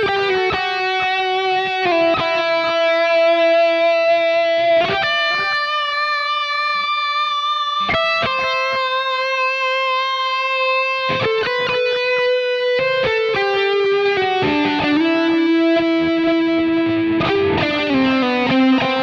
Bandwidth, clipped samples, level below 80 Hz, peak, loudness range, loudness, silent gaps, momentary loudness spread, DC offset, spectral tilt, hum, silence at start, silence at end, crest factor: 7.2 kHz; under 0.1%; -52 dBFS; -6 dBFS; 2 LU; -17 LUFS; none; 3 LU; under 0.1%; -5 dB/octave; none; 0 s; 0 s; 10 dB